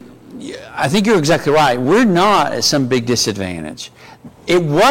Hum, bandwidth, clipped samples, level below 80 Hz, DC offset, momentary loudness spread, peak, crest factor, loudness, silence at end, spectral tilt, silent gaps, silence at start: none; 17 kHz; under 0.1%; -46 dBFS; under 0.1%; 18 LU; -6 dBFS; 10 dB; -14 LUFS; 0 s; -4.5 dB/octave; none; 0.05 s